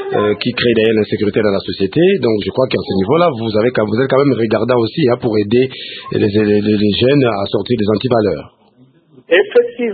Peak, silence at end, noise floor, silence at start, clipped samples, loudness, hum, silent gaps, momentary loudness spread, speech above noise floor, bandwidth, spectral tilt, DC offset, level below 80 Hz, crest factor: 0 dBFS; 0 s; -49 dBFS; 0 s; under 0.1%; -14 LUFS; none; none; 5 LU; 36 dB; 4.8 kHz; -10 dB/octave; under 0.1%; -48 dBFS; 14 dB